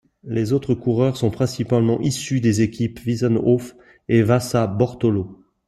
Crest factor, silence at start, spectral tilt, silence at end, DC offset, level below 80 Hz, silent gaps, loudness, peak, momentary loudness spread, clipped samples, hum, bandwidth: 16 dB; 0.25 s; -7 dB/octave; 0.35 s; under 0.1%; -50 dBFS; none; -20 LUFS; -4 dBFS; 7 LU; under 0.1%; none; 13 kHz